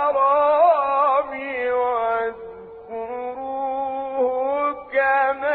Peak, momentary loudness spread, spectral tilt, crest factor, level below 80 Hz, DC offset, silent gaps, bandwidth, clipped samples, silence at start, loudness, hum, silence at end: -6 dBFS; 14 LU; -8 dB/octave; 14 dB; -60 dBFS; under 0.1%; none; 4.4 kHz; under 0.1%; 0 s; -21 LUFS; none; 0 s